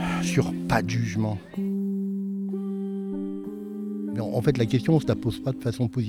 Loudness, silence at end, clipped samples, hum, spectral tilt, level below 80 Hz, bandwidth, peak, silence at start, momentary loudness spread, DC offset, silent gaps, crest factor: -27 LUFS; 0 s; under 0.1%; none; -7 dB/octave; -50 dBFS; 16 kHz; -8 dBFS; 0 s; 9 LU; under 0.1%; none; 18 dB